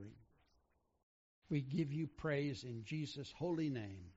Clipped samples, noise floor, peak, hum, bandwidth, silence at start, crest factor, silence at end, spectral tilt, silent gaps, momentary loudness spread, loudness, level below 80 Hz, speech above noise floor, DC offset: under 0.1%; -79 dBFS; -26 dBFS; none; 7.6 kHz; 0 s; 16 dB; 0.05 s; -6.5 dB/octave; 1.03-1.42 s; 7 LU; -42 LUFS; -70 dBFS; 37 dB; under 0.1%